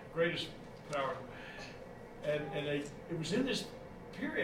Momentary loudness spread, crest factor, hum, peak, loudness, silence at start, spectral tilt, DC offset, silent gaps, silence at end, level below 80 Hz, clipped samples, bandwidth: 15 LU; 18 dB; none; -20 dBFS; -39 LUFS; 0 s; -5 dB/octave; under 0.1%; none; 0 s; -60 dBFS; under 0.1%; 16 kHz